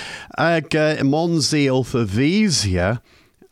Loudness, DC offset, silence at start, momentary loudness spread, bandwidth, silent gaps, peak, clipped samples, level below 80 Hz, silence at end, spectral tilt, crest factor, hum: -18 LUFS; under 0.1%; 0 s; 5 LU; 14.5 kHz; none; -6 dBFS; under 0.1%; -46 dBFS; 0.55 s; -5 dB/octave; 12 dB; none